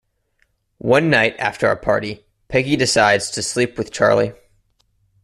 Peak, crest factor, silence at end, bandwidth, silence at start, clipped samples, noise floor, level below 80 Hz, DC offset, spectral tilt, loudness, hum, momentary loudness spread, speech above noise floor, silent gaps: -2 dBFS; 18 dB; 0.9 s; 13.5 kHz; 0.85 s; under 0.1%; -65 dBFS; -50 dBFS; under 0.1%; -4 dB/octave; -17 LUFS; none; 9 LU; 48 dB; none